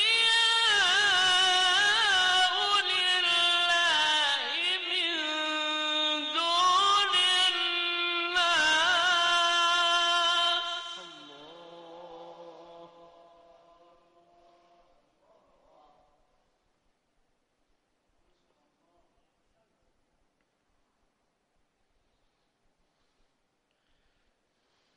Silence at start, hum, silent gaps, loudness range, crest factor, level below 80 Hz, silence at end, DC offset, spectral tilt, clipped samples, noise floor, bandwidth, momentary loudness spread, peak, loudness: 0 s; none; none; 6 LU; 14 dB; -70 dBFS; 12.1 s; under 0.1%; 1 dB/octave; under 0.1%; -76 dBFS; 11.5 kHz; 7 LU; -16 dBFS; -24 LUFS